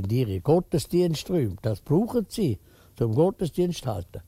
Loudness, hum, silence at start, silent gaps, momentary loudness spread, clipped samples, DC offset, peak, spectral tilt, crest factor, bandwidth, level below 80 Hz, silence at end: -26 LUFS; none; 0 s; none; 7 LU; under 0.1%; under 0.1%; -8 dBFS; -7.5 dB/octave; 16 dB; 16 kHz; -48 dBFS; 0.05 s